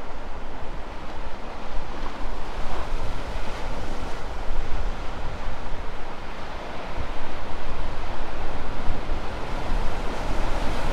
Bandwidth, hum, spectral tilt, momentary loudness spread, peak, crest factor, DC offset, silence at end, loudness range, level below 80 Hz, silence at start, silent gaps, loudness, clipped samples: 6.8 kHz; none; -5.5 dB/octave; 6 LU; -6 dBFS; 14 dB; under 0.1%; 0 s; 3 LU; -28 dBFS; 0 s; none; -34 LUFS; under 0.1%